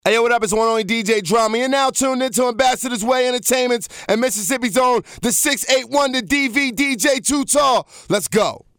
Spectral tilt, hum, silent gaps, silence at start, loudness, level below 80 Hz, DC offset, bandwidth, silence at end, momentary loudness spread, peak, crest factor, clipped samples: -2.5 dB/octave; none; none; 0.05 s; -17 LUFS; -50 dBFS; under 0.1%; over 20 kHz; 0.2 s; 4 LU; -2 dBFS; 16 dB; under 0.1%